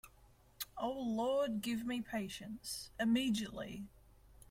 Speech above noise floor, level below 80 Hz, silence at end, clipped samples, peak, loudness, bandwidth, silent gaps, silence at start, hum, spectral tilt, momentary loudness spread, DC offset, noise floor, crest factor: 27 dB; -66 dBFS; 0.1 s; under 0.1%; -24 dBFS; -39 LUFS; 16.5 kHz; none; 0.05 s; none; -4.5 dB/octave; 13 LU; under 0.1%; -65 dBFS; 16 dB